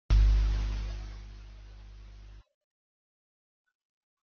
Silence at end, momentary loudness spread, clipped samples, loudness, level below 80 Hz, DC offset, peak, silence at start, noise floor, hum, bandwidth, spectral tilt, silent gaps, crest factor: 1.95 s; 26 LU; under 0.1%; -31 LUFS; -32 dBFS; under 0.1%; -14 dBFS; 0.1 s; -50 dBFS; 50 Hz at -45 dBFS; 6.4 kHz; -6.5 dB/octave; none; 18 dB